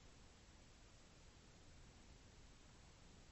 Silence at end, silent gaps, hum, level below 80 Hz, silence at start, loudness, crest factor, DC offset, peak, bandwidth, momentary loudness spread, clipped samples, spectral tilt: 0 s; none; none; -68 dBFS; 0 s; -66 LUFS; 12 dB; under 0.1%; -52 dBFS; 8.2 kHz; 1 LU; under 0.1%; -4 dB/octave